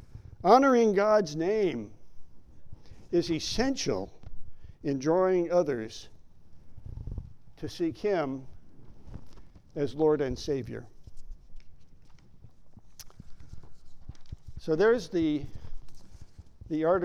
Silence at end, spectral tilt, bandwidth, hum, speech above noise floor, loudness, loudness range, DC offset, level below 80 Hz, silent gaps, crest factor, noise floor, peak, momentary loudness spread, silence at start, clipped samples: 0 s; -5.5 dB/octave; 14 kHz; none; 23 dB; -27 LUFS; 8 LU; under 0.1%; -48 dBFS; none; 22 dB; -49 dBFS; -8 dBFS; 26 LU; 0.05 s; under 0.1%